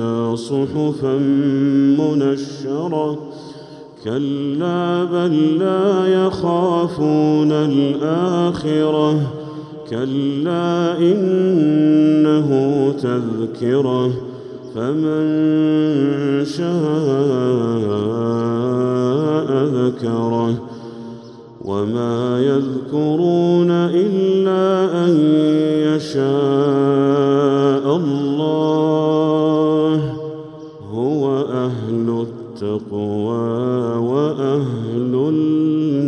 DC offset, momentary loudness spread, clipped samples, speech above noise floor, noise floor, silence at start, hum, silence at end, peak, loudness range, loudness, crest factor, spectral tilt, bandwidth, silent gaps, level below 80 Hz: under 0.1%; 9 LU; under 0.1%; 21 dB; -37 dBFS; 0 s; none; 0 s; -4 dBFS; 5 LU; -17 LUFS; 14 dB; -8 dB/octave; 9.2 kHz; none; -58 dBFS